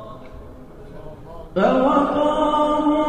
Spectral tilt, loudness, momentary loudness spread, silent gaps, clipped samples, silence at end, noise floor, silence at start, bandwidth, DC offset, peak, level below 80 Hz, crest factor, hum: -7 dB/octave; -18 LUFS; 23 LU; none; under 0.1%; 0 s; -39 dBFS; 0 s; 9.2 kHz; under 0.1%; -4 dBFS; -42 dBFS; 16 dB; none